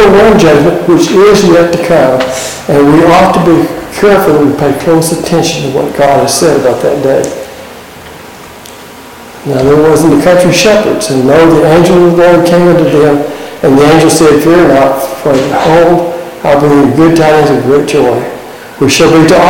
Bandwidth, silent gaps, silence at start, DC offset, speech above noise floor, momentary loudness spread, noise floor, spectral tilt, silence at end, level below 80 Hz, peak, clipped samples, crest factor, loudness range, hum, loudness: 17.5 kHz; none; 0 s; under 0.1%; 23 dB; 8 LU; -28 dBFS; -5.5 dB/octave; 0 s; -34 dBFS; 0 dBFS; under 0.1%; 6 dB; 5 LU; none; -6 LUFS